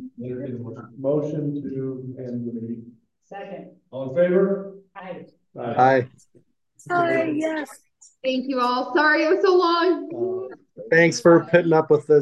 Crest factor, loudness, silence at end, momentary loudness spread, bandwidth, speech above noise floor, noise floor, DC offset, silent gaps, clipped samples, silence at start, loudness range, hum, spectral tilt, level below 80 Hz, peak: 20 dB; -21 LUFS; 0 s; 20 LU; 12 kHz; 39 dB; -60 dBFS; under 0.1%; none; under 0.1%; 0 s; 11 LU; none; -6 dB/octave; -68 dBFS; -2 dBFS